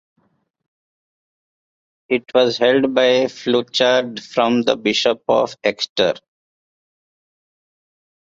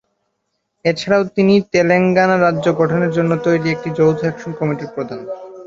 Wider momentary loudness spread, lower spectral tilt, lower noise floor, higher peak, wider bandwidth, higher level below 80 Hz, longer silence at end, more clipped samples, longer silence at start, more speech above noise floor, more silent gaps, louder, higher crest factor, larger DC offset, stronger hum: second, 6 LU vs 11 LU; second, -4 dB/octave vs -7 dB/octave; first, under -90 dBFS vs -72 dBFS; about the same, -2 dBFS vs 0 dBFS; about the same, 7.6 kHz vs 7.8 kHz; second, -64 dBFS vs -54 dBFS; first, 2.1 s vs 0 s; neither; first, 2.1 s vs 0.85 s; first, over 73 dB vs 56 dB; first, 5.89-5.96 s vs none; about the same, -17 LUFS vs -16 LUFS; about the same, 18 dB vs 16 dB; neither; neither